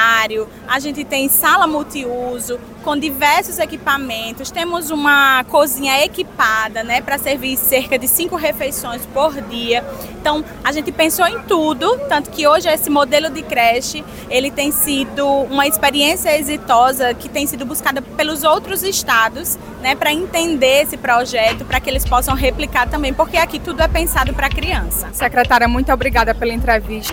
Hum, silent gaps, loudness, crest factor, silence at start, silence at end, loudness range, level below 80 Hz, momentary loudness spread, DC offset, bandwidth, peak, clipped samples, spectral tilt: none; none; -16 LUFS; 14 dB; 0 s; 0 s; 2 LU; -30 dBFS; 8 LU; under 0.1%; 17 kHz; -2 dBFS; under 0.1%; -3 dB/octave